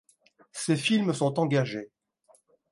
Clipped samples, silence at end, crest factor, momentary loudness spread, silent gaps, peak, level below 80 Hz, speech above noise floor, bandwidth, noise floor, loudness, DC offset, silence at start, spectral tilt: under 0.1%; 0.85 s; 18 dB; 16 LU; none; -12 dBFS; -74 dBFS; 38 dB; 11.5 kHz; -64 dBFS; -27 LUFS; under 0.1%; 0.55 s; -5.5 dB/octave